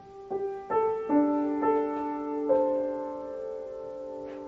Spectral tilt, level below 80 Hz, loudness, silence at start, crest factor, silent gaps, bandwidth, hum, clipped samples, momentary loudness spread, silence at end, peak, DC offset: -6.5 dB/octave; -66 dBFS; -29 LUFS; 0 s; 16 dB; none; 5.6 kHz; none; under 0.1%; 13 LU; 0 s; -14 dBFS; under 0.1%